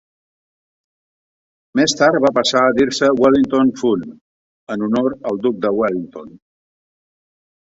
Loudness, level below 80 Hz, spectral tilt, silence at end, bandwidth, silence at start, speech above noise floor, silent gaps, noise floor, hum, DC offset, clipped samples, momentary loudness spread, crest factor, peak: -16 LUFS; -56 dBFS; -4.5 dB/octave; 1.35 s; 8 kHz; 1.75 s; over 74 dB; 4.21-4.67 s; under -90 dBFS; none; under 0.1%; under 0.1%; 12 LU; 16 dB; -2 dBFS